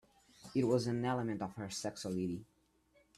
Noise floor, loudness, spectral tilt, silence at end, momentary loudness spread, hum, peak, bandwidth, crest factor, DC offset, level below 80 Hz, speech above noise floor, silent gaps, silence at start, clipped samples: -72 dBFS; -38 LUFS; -6 dB/octave; 0.75 s; 8 LU; none; -20 dBFS; 14.5 kHz; 18 dB; under 0.1%; -70 dBFS; 35 dB; none; 0.4 s; under 0.1%